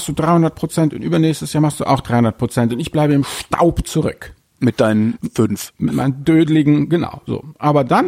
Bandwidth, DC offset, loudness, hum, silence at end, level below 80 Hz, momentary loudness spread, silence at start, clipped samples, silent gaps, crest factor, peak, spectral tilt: 16 kHz; under 0.1%; -17 LUFS; none; 0 s; -40 dBFS; 7 LU; 0 s; under 0.1%; none; 14 dB; -2 dBFS; -6.5 dB/octave